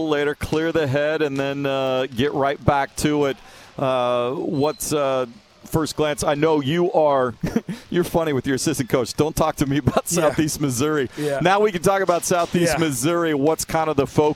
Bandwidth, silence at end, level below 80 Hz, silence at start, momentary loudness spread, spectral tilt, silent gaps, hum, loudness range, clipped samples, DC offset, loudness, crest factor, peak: 17 kHz; 0 s; -44 dBFS; 0 s; 5 LU; -5 dB/octave; none; none; 2 LU; under 0.1%; under 0.1%; -21 LUFS; 20 dB; -2 dBFS